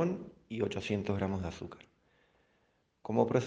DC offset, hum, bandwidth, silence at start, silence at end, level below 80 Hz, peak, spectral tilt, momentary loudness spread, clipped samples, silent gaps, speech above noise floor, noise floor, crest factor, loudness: under 0.1%; none; 9.2 kHz; 0 s; 0 s; -66 dBFS; -12 dBFS; -7 dB/octave; 16 LU; under 0.1%; none; 41 dB; -74 dBFS; 24 dB; -35 LUFS